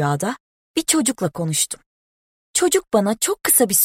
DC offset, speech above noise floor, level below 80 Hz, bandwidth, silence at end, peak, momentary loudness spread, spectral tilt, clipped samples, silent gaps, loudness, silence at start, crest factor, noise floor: under 0.1%; over 71 dB; -58 dBFS; 16.5 kHz; 0 s; 0 dBFS; 11 LU; -3 dB/octave; under 0.1%; 0.40-0.74 s, 1.86-2.54 s; -19 LUFS; 0 s; 20 dB; under -90 dBFS